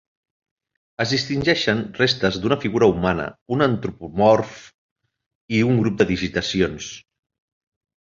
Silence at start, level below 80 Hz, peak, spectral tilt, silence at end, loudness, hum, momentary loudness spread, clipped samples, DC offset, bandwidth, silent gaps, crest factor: 1 s; -46 dBFS; -2 dBFS; -5.5 dB/octave; 1 s; -20 LUFS; none; 10 LU; under 0.1%; under 0.1%; 7.6 kHz; 3.41-3.46 s, 4.74-4.96 s, 5.26-5.48 s; 20 dB